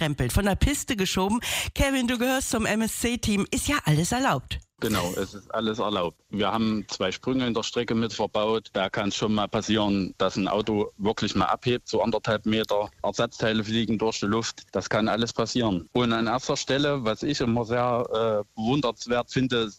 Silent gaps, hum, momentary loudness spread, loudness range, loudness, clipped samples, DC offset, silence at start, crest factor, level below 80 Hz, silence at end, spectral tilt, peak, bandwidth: none; none; 4 LU; 2 LU; -26 LUFS; under 0.1%; under 0.1%; 0 s; 16 dB; -42 dBFS; 0.05 s; -4.5 dB/octave; -10 dBFS; 16 kHz